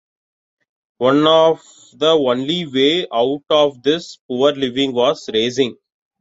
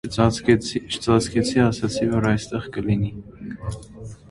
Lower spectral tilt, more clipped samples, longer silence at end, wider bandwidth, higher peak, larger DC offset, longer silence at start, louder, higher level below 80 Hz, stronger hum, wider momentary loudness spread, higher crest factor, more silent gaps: about the same, -5 dB/octave vs -6 dB/octave; neither; first, 0.5 s vs 0.15 s; second, 8 kHz vs 11.5 kHz; about the same, -2 dBFS vs -2 dBFS; neither; first, 1 s vs 0.05 s; first, -16 LUFS vs -22 LUFS; second, -62 dBFS vs -42 dBFS; neither; second, 7 LU vs 17 LU; about the same, 16 dB vs 20 dB; first, 4.21-4.29 s vs none